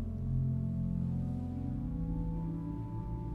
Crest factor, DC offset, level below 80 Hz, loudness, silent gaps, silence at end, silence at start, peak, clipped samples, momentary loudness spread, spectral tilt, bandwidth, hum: 12 dB; under 0.1%; -44 dBFS; -37 LUFS; none; 0 s; 0 s; -24 dBFS; under 0.1%; 6 LU; -11.5 dB/octave; 2.9 kHz; none